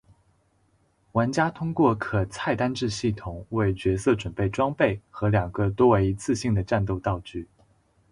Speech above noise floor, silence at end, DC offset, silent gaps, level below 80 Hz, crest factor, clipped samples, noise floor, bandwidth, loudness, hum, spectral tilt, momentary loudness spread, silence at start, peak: 41 dB; 0.7 s; under 0.1%; none; -44 dBFS; 20 dB; under 0.1%; -66 dBFS; 11.5 kHz; -25 LUFS; none; -6.5 dB/octave; 7 LU; 1.15 s; -6 dBFS